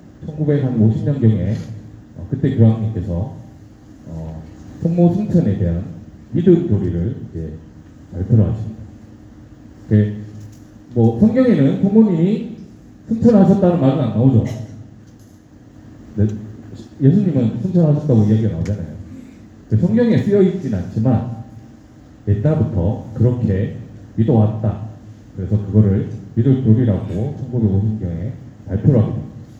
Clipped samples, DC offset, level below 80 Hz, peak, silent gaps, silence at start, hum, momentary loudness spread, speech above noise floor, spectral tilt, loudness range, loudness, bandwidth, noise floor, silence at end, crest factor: under 0.1%; under 0.1%; -42 dBFS; 0 dBFS; none; 0.05 s; none; 20 LU; 28 dB; -10.5 dB/octave; 6 LU; -17 LUFS; 7.2 kHz; -43 dBFS; 0 s; 18 dB